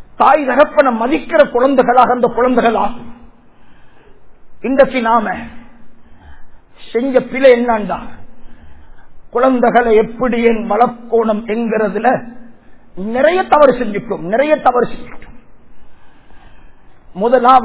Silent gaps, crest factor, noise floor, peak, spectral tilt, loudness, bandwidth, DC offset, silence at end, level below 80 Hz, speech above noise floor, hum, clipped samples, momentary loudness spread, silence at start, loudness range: none; 14 dB; -41 dBFS; 0 dBFS; -9.5 dB/octave; -13 LUFS; 4 kHz; 1%; 0 s; -42 dBFS; 29 dB; none; 0.4%; 12 LU; 0 s; 5 LU